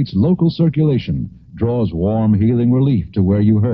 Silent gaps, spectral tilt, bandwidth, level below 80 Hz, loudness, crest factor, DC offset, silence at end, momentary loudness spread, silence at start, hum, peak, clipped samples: none; -11.5 dB/octave; 5.6 kHz; -38 dBFS; -16 LUFS; 12 dB; under 0.1%; 0 s; 8 LU; 0 s; none; -4 dBFS; under 0.1%